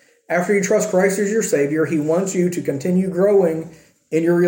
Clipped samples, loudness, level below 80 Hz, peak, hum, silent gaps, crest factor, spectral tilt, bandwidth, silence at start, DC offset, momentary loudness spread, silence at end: under 0.1%; -18 LUFS; -64 dBFS; -4 dBFS; none; none; 14 dB; -6 dB/octave; 17 kHz; 0.3 s; under 0.1%; 7 LU; 0 s